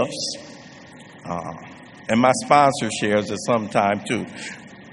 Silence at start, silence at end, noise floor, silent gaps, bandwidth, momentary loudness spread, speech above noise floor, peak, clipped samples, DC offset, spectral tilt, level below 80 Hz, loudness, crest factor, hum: 0 s; 0 s; -43 dBFS; none; 11.5 kHz; 23 LU; 22 dB; 0 dBFS; under 0.1%; under 0.1%; -4.5 dB/octave; -60 dBFS; -21 LUFS; 22 dB; none